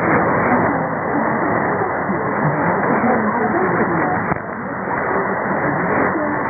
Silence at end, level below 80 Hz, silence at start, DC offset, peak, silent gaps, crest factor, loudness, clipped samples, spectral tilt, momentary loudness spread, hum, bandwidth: 0 s; -46 dBFS; 0 s; under 0.1%; -2 dBFS; none; 16 dB; -18 LUFS; under 0.1%; -16 dB/octave; 5 LU; none; 2.6 kHz